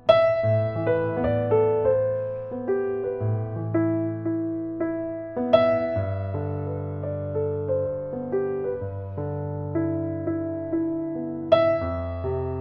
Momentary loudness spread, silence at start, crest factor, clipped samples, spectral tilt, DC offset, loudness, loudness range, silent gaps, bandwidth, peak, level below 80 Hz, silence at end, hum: 10 LU; 0.05 s; 22 dB; under 0.1%; -10 dB/octave; under 0.1%; -25 LUFS; 4 LU; none; 5.8 kHz; -4 dBFS; -50 dBFS; 0 s; none